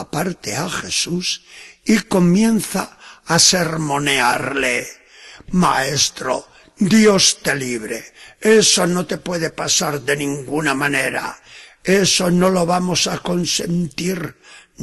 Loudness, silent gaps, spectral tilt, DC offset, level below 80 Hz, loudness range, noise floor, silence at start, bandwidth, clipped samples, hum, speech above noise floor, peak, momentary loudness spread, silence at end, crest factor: -17 LUFS; none; -3.5 dB/octave; under 0.1%; -50 dBFS; 3 LU; -41 dBFS; 0 s; 12.5 kHz; under 0.1%; none; 23 dB; 0 dBFS; 13 LU; 0 s; 18 dB